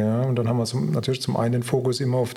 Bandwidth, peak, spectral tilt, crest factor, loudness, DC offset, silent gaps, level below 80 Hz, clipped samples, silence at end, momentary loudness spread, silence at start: 14.5 kHz; -8 dBFS; -6.5 dB/octave; 14 dB; -23 LUFS; under 0.1%; none; -60 dBFS; under 0.1%; 0 s; 2 LU; 0 s